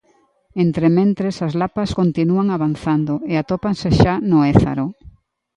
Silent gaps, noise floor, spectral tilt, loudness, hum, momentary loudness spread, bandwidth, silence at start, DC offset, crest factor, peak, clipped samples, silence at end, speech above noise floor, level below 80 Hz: none; -59 dBFS; -8 dB/octave; -18 LUFS; none; 7 LU; 9.8 kHz; 0.55 s; under 0.1%; 18 dB; 0 dBFS; under 0.1%; 0.45 s; 42 dB; -38 dBFS